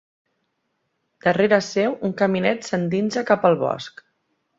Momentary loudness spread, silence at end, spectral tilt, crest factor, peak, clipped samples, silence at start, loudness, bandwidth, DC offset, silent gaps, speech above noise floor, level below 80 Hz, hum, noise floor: 6 LU; 0.7 s; -6 dB/octave; 20 dB; -2 dBFS; under 0.1%; 1.25 s; -21 LUFS; 7.8 kHz; under 0.1%; none; 53 dB; -64 dBFS; none; -73 dBFS